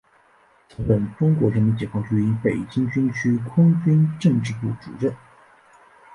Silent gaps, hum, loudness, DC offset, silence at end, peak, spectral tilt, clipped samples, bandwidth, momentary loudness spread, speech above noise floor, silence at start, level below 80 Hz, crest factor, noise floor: none; none; -21 LUFS; under 0.1%; 0 s; -6 dBFS; -8.5 dB/octave; under 0.1%; 10.5 kHz; 9 LU; 37 dB; 0.8 s; -48 dBFS; 16 dB; -57 dBFS